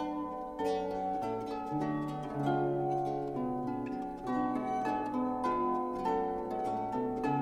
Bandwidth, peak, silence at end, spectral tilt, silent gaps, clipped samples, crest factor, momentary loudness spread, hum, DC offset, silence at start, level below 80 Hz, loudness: 14 kHz; -20 dBFS; 0 s; -8 dB/octave; none; under 0.1%; 14 dB; 5 LU; none; under 0.1%; 0 s; -60 dBFS; -34 LUFS